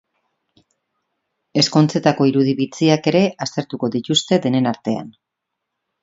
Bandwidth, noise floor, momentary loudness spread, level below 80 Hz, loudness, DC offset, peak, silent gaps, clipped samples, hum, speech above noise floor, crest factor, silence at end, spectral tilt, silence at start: 8 kHz; -80 dBFS; 9 LU; -62 dBFS; -18 LUFS; under 0.1%; 0 dBFS; none; under 0.1%; none; 62 dB; 20 dB; 0.95 s; -5.5 dB/octave; 1.55 s